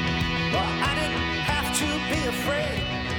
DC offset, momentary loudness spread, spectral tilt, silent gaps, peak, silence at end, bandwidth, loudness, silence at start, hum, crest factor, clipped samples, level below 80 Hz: under 0.1%; 2 LU; -4 dB/octave; none; -12 dBFS; 0 s; 19.5 kHz; -25 LUFS; 0 s; none; 14 dB; under 0.1%; -38 dBFS